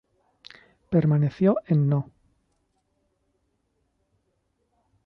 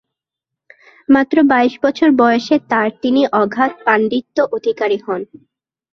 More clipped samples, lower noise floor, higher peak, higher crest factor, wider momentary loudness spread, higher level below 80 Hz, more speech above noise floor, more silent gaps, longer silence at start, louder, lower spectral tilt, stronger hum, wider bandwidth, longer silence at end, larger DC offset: neither; second, -73 dBFS vs -83 dBFS; second, -10 dBFS vs 0 dBFS; about the same, 18 dB vs 16 dB; about the same, 6 LU vs 8 LU; about the same, -62 dBFS vs -60 dBFS; second, 52 dB vs 69 dB; neither; second, 0.9 s vs 1.1 s; second, -23 LUFS vs -15 LUFS; first, -11 dB/octave vs -6 dB/octave; neither; second, 5.6 kHz vs 6.4 kHz; first, 3.05 s vs 0.7 s; neither